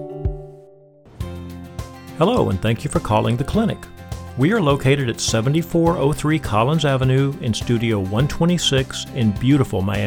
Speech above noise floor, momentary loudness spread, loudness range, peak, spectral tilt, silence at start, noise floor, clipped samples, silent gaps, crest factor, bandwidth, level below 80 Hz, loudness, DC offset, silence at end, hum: 29 dB; 16 LU; 3 LU; -4 dBFS; -6 dB/octave; 0 s; -47 dBFS; under 0.1%; none; 16 dB; 17.5 kHz; -36 dBFS; -19 LUFS; under 0.1%; 0 s; none